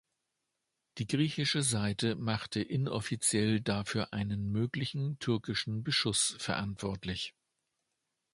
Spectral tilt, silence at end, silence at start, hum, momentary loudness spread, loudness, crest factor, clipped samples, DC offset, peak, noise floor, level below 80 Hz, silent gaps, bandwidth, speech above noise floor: -4 dB/octave; 1.05 s; 0.95 s; none; 8 LU; -33 LUFS; 18 dB; under 0.1%; under 0.1%; -16 dBFS; -85 dBFS; -60 dBFS; none; 11.5 kHz; 52 dB